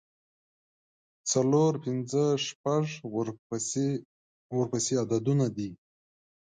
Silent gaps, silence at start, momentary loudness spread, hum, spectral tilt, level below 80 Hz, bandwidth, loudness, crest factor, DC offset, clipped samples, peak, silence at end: 2.55-2.64 s, 3.39-3.50 s, 4.05-4.50 s; 1.25 s; 10 LU; none; -5.5 dB/octave; -70 dBFS; 9.6 kHz; -29 LUFS; 16 dB; under 0.1%; under 0.1%; -14 dBFS; 0.7 s